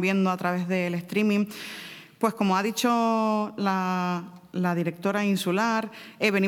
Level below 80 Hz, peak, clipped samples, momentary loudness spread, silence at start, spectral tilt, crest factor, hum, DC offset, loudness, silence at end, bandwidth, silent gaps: -72 dBFS; -8 dBFS; under 0.1%; 10 LU; 0 s; -5.5 dB/octave; 18 dB; none; under 0.1%; -26 LUFS; 0 s; 18 kHz; none